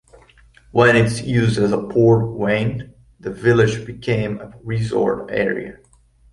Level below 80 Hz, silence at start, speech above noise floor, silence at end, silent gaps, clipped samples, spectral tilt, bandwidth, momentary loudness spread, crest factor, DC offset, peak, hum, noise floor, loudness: -46 dBFS; 0.75 s; 32 dB; 0.6 s; none; under 0.1%; -7 dB/octave; 11.5 kHz; 14 LU; 16 dB; under 0.1%; -2 dBFS; none; -50 dBFS; -18 LUFS